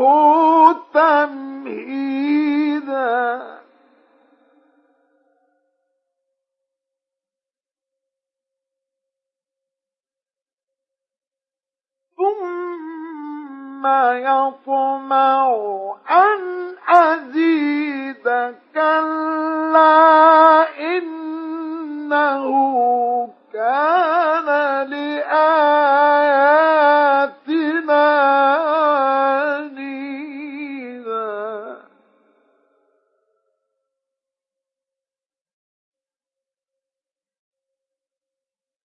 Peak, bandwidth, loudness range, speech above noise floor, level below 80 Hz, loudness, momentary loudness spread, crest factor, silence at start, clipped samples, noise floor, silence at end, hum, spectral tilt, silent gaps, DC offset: 0 dBFS; 6 kHz; 15 LU; over 75 dB; -86 dBFS; -16 LUFS; 17 LU; 18 dB; 0 s; under 0.1%; under -90 dBFS; 7.1 s; none; -5 dB/octave; 10.42-10.46 s; under 0.1%